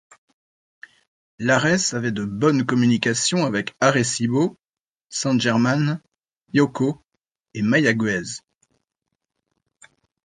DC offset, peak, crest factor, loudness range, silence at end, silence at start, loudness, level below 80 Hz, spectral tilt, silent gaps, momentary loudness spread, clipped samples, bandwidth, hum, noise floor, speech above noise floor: under 0.1%; -2 dBFS; 20 dB; 4 LU; 1.85 s; 1.4 s; -21 LUFS; -60 dBFS; -4.5 dB/octave; 4.69-4.73 s, 4.81-4.96 s, 6.41-6.45 s; 9 LU; under 0.1%; 10 kHz; none; -80 dBFS; 60 dB